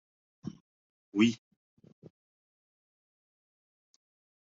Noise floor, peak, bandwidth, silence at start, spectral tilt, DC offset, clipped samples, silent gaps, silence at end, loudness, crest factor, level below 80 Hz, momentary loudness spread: under -90 dBFS; -14 dBFS; 7.2 kHz; 0.45 s; -4.5 dB/octave; under 0.1%; under 0.1%; 0.60-1.12 s; 3.1 s; -29 LUFS; 26 dB; -78 dBFS; 19 LU